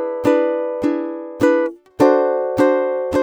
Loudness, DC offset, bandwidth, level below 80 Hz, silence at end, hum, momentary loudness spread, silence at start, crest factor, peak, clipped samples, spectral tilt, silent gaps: -18 LUFS; under 0.1%; 16 kHz; -52 dBFS; 0 s; none; 7 LU; 0 s; 14 dB; -2 dBFS; under 0.1%; -6.5 dB/octave; none